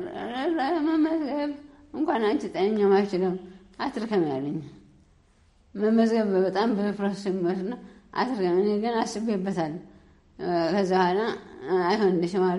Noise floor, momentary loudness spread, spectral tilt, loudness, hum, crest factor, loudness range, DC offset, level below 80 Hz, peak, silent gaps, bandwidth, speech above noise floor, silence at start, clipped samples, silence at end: -60 dBFS; 13 LU; -6.5 dB/octave; -26 LUFS; none; 16 dB; 3 LU; under 0.1%; -62 dBFS; -10 dBFS; none; 11.5 kHz; 35 dB; 0 s; under 0.1%; 0 s